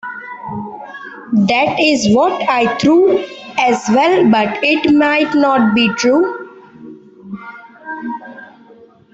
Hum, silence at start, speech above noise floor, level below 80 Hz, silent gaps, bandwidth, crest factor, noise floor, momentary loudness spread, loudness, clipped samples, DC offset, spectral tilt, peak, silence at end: none; 0.05 s; 31 dB; -54 dBFS; none; 8.2 kHz; 12 dB; -43 dBFS; 19 LU; -13 LUFS; under 0.1%; under 0.1%; -5 dB/octave; -2 dBFS; 0.7 s